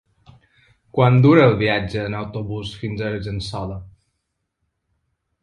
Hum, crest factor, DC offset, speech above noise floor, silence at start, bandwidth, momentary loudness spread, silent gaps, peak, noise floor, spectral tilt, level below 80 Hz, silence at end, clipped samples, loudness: none; 20 dB; under 0.1%; 57 dB; 0.95 s; 10 kHz; 16 LU; none; 0 dBFS; -76 dBFS; -8 dB/octave; -46 dBFS; 1.55 s; under 0.1%; -19 LUFS